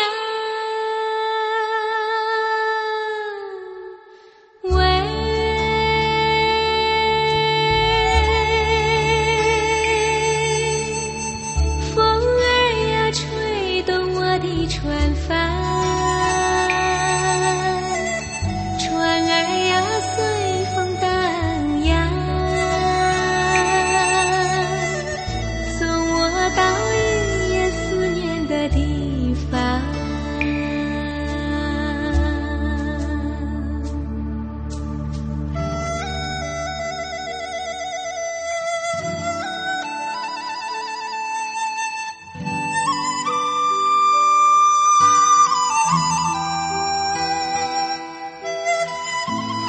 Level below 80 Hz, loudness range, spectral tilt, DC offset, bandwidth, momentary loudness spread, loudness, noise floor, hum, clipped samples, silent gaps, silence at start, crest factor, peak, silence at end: -30 dBFS; 9 LU; -4 dB/octave; under 0.1%; 8.8 kHz; 10 LU; -20 LUFS; -47 dBFS; none; under 0.1%; none; 0 s; 18 dB; -2 dBFS; 0 s